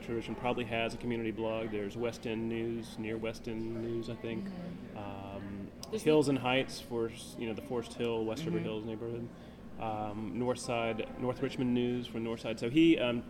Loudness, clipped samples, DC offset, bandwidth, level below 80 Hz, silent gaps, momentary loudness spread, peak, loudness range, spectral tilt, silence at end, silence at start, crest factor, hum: -35 LUFS; under 0.1%; under 0.1%; 15.5 kHz; -56 dBFS; none; 14 LU; -16 dBFS; 5 LU; -6 dB/octave; 0 s; 0 s; 20 dB; none